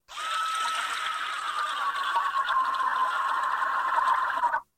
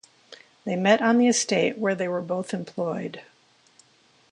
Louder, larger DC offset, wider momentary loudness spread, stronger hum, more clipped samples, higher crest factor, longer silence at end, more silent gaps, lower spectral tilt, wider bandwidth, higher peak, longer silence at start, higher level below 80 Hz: second, -27 LUFS vs -24 LUFS; neither; second, 4 LU vs 15 LU; neither; neither; about the same, 16 dB vs 20 dB; second, 0.15 s vs 1.1 s; neither; second, 1 dB/octave vs -4 dB/octave; first, 16 kHz vs 11 kHz; second, -12 dBFS vs -4 dBFS; second, 0.1 s vs 0.3 s; about the same, -70 dBFS vs -74 dBFS